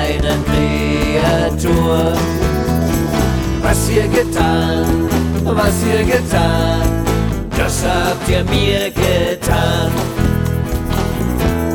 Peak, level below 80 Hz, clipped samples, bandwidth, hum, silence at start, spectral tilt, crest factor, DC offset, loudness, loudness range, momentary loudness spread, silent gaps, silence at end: 0 dBFS; -22 dBFS; under 0.1%; 19 kHz; none; 0 s; -5.5 dB/octave; 14 dB; under 0.1%; -15 LUFS; 1 LU; 3 LU; none; 0 s